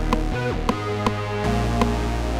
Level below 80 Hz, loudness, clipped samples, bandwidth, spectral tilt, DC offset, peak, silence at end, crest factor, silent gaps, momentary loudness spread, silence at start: -28 dBFS; -24 LUFS; under 0.1%; 15.5 kHz; -6 dB/octave; under 0.1%; -6 dBFS; 0 s; 16 dB; none; 3 LU; 0 s